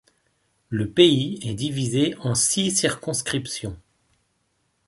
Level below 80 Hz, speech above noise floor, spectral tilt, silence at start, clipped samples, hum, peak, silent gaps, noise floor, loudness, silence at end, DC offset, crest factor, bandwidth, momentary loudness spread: -52 dBFS; 48 dB; -4 dB/octave; 0.7 s; under 0.1%; none; -2 dBFS; none; -70 dBFS; -22 LUFS; 1.1 s; under 0.1%; 22 dB; 12 kHz; 14 LU